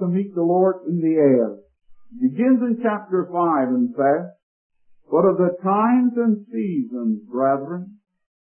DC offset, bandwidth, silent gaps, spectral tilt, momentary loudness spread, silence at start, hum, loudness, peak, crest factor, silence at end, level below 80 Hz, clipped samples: under 0.1%; 3.3 kHz; 4.43-4.70 s; -13.5 dB/octave; 8 LU; 0 s; none; -20 LUFS; -4 dBFS; 16 dB; 0.55 s; -70 dBFS; under 0.1%